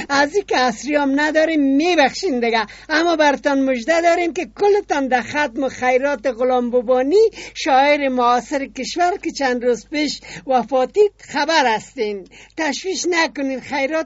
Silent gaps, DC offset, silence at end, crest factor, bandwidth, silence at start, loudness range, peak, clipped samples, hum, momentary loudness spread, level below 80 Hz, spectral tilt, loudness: none; under 0.1%; 0 s; 18 dB; 8 kHz; 0 s; 3 LU; 0 dBFS; under 0.1%; none; 7 LU; -52 dBFS; -1 dB/octave; -18 LUFS